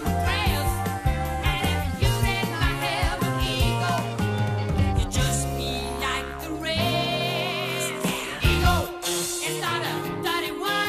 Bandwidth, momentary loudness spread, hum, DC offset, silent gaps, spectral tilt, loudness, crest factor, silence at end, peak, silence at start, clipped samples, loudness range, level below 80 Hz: 14.5 kHz; 4 LU; none; under 0.1%; none; -4.5 dB/octave; -25 LUFS; 16 dB; 0 s; -8 dBFS; 0 s; under 0.1%; 1 LU; -32 dBFS